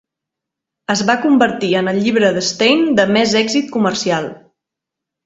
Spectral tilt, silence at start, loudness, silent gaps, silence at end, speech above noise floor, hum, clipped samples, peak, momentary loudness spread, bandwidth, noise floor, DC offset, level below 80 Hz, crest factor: -4 dB/octave; 0.9 s; -15 LUFS; none; 0.9 s; 68 dB; none; under 0.1%; 0 dBFS; 6 LU; 8 kHz; -82 dBFS; under 0.1%; -56 dBFS; 16 dB